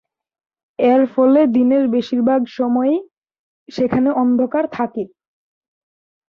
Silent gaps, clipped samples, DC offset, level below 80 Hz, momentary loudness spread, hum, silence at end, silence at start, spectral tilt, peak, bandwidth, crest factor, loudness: 3.13-3.22 s, 3.39-3.66 s; under 0.1%; under 0.1%; -60 dBFS; 10 LU; none; 1.2 s; 0.8 s; -8 dB/octave; -4 dBFS; 6.2 kHz; 14 dB; -16 LUFS